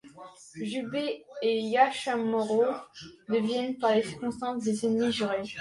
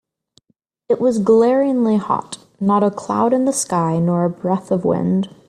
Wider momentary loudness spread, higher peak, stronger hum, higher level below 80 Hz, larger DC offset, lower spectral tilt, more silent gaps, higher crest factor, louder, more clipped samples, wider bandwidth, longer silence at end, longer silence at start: first, 14 LU vs 8 LU; second, -10 dBFS vs -4 dBFS; neither; second, -68 dBFS vs -58 dBFS; neither; second, -4.5 dB/octave vs -6.5 dB/octave; neither; first, 20 dB vs 14 dB; second, -29 LUFS vs -17 LUFS; neither; second, 11.5 kHz vs 13.5 kHz; second, 0 s vs 0.2 s; second, 0.05 s vs 0.9 s